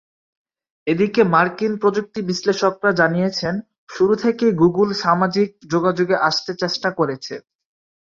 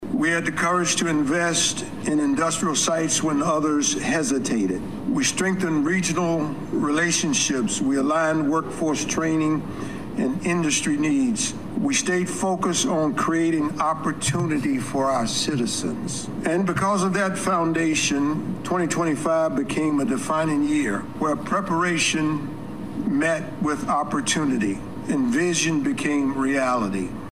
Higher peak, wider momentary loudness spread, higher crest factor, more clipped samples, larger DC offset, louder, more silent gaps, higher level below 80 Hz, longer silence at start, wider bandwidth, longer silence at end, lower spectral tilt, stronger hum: first, -2 dBFS vs -8 dBFS; first, 9 LU vs 6 LU; about the same, 18 dB vs 14 dB; neither; second, under 0.1% vs 0.6%; first, -19 LUFS vs -22 LUFS; first, 3.78-3.87 s vs none; second, -58 dBFS vs -52 dBFS; first, 0.85 s vs 0 s; second, 7.6 kHz vs 14.5 kHz; first, 0.7 s vs 0 s; first, -5.5 dB/octave vs -4 dB/octave; neither